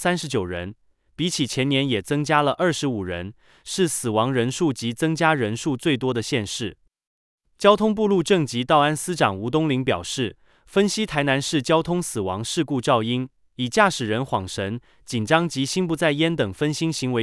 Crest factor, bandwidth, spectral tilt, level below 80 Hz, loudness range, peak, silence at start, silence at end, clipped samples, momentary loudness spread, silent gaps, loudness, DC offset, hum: 20 dB; 12 kHz; -4.5 dB/octave; -56 dBFS; 2 LU; -2 dBFS; 0 s; 0 s; under 0.1%; 10 LU; 7.07-7.38 s; -22 LUFS; under 0.1%; none